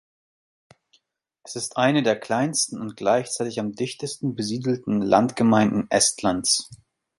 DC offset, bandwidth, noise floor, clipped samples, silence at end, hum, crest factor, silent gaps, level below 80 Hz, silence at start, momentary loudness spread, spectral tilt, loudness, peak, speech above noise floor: under 0.1%; 11.5 kHz; -69 dBFS; under 0.1%; 0.45 s; none; 20 dB; none; -60 dBFS; 1.45 s; 10 LU; -4 dB/octave; -22 LUFS; -4 dBFS; 46 dB